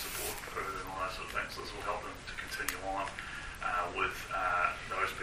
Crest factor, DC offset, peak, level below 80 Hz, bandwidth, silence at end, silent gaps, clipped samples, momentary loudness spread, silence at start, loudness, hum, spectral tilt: 22 dB; under 0.1%; -14 dBFS; -52 dBFS; 15.5 kHz; 0 s; none; under 0.1%; 8 LU; 0 s; -36 LUFS; none; -2.5 dB/octave